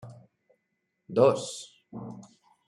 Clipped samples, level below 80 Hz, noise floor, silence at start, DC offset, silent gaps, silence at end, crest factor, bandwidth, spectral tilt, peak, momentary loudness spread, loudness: under 0.1%; -74 dBFS; -79 dBFS; 0.05 s; under 0.1%; none; 0.45 s; 24 dB; 11.5 kHz; -5.5 dB/octave; -8 dBFS; 21 LU; -26 LUFS